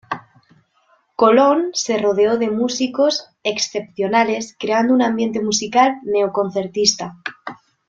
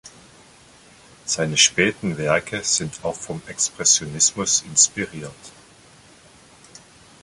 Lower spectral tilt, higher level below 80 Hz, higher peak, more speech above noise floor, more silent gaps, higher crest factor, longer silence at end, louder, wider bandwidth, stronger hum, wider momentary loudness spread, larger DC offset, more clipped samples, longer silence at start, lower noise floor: first, -3 dB/octave vs -1.5 dB/octave; second, -62 dBFS vs -56 dBFS; about the same, -2 dBFS vs -2 dBFS; first, 42 dB vs 28 dB; neither; second, 16 dB vs 22 dB; second, 0.35 s vs 1.75 s; about the same, -17 LUFS vs -19 LUFS; second, 7.8 kHz vs 11.5 kHz; neither; about the same, 15 LU vs 16 LU; neither; neither; about the same, 0.1 s vs 0.05 s; first, -60 dBFS vs -50 dBFS